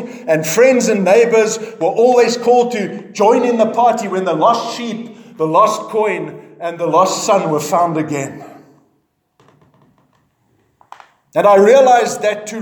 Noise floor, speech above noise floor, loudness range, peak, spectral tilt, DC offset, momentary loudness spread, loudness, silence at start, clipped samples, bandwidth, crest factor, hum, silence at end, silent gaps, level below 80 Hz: -63 dBFS; 50 dB; 8 LU; 0 dBFS; -4.5 dB/octave; under 0.1%; 13 LU; -13 LUFS; 0 s; under 0.1%; over 20 kHz; 14 dB; none; 0 s; none; -70 dBFS